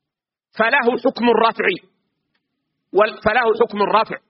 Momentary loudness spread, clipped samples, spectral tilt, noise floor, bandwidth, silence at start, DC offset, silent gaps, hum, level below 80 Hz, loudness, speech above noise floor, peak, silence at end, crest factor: 5 LU; under 0.1%; -2 dB/octave; -85 dBFS; 5.8 kHz; 0.55 s; under 0.1%; none; none; -56 dBFS; -17 LUFS; 68 dB; -2 dBFS; 0.15 s; 18 dB